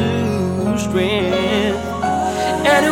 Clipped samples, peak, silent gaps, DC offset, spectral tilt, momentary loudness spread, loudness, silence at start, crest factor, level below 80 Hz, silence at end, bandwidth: under 0.1%; -2 dBFS; none; under 0.1%; -5 dB/octave; 5 LU; -18 LUFS; 0 s; 16 dB; -40 dBFS; 0 s; 17.5 kHz